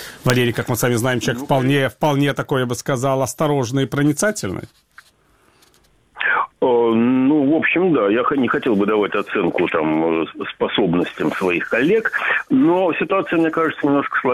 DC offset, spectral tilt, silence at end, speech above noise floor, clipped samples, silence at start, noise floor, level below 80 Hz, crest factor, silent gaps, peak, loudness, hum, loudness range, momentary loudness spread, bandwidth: under 0.1%; -5.5 dB/octave; 0 s; 39 dB; under 0.1%; 0 s; -56 dBFS; -54 dBFS; 18 dB; none; 0 dBFS; -18 LUFS; none; 5 LU; 5 LU; 19 kHz